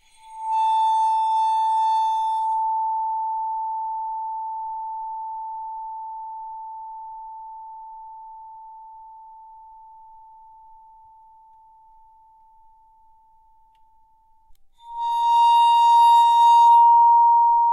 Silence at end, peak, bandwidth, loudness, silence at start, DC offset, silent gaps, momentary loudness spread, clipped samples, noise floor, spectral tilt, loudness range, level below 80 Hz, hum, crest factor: 0 s; -8 dBFS; 12 kHz; -18 LUFS; 0.3 s; under 0.1%; none; 25 LU; under 0.1%; -57 dBFS; 3 dB/octave; 25 LU; -64 dBFS; none; 14 dB